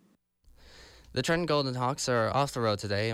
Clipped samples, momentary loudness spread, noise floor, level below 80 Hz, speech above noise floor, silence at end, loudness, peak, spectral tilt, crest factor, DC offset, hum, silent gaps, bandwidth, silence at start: under 0.1%; 4 LU; -64 dBFS; -58 dBFS; 35 dB; 0 s; -29 LUFS; -16 dBFS; -4.5 dB/octave; 14 dB; under 0.1%; none; none; 15.5 kHz; 0.65 s